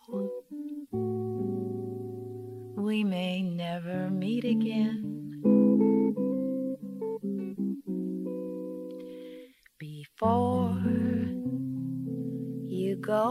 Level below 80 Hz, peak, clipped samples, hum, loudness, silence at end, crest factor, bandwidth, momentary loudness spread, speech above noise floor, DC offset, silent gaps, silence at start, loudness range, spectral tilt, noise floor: -68 dBFS; -12 dBFS; under 0.1%; none; -30 LUFS; 0 s; 18 dB; 13.5 kHz; 15 LU; 21 dB; under 0.1%; none; 0.1 s; 7 LU; -8.5 dB/octave; -50 dBFS